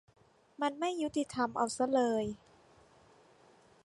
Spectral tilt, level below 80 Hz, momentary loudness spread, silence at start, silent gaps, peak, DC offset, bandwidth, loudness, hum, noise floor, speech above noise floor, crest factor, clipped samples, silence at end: -4.5 dB/octave; -70 dBFS; 7 LU; 0.6 s; none; -18 dBFS; under 0.1%; 11.5 kHz; -34 LUFS; none; -63 dBFS; 31 dB; 18 dB; under 0.1%; 1.5 s